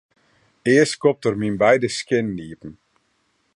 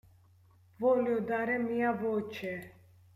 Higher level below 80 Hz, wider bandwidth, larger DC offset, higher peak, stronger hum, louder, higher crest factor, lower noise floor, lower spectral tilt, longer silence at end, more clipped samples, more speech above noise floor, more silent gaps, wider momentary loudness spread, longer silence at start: first, -56 dBFS vs -72 dBFS; second, 11.5 kHz vs 14.5 kHz; neither; first, -2 dBFS vs -18 dBFS; neither; first, -19 LUFS vs -32 LUFS; about the same, 18 dB vs 16 dB; first, -67 dBFS vs -62 dBFS; second, -5 dB/octave vs -7.5 dB/octave; first, 0.85 s vs 0.45 s; neither; first, 48 dB vs 31 dB; neither; first, 19 LU vs 11 LU; second, 0.65 s vs 0.8 s